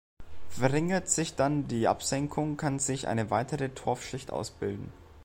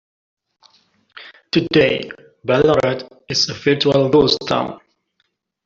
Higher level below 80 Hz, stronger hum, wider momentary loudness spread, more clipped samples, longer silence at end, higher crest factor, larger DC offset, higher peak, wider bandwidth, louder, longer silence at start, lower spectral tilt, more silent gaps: about the same, -54 dBFS vs -50 dBFS; neither; second, 9 LU vs 13 LU; neither; second, 0 s vs 0.9 s; about the same, 20 dB vs 16 dB; neither; second, -10 dBFS vs -2 dBFS; first, 16.5 kHz vs 7.6 kHz; second, -30 LUFS vs -17 LUFS; second, 0.15 s vs 1.15 s; about the same, -4.5 dB/octave vs -5 dB/octave; neither